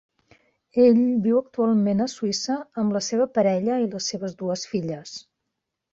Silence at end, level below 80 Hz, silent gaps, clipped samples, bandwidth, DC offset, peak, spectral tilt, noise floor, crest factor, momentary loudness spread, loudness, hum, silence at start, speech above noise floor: 0.7 s; -66 dBFS; none; under 0.1%; 8 kHz; under 0.1%; -8 dBFS; -5.5 dB/octave; -81 dBFS; 16 dB; 11 LU; -23 LUFS; none; 0.75 s; 59 dB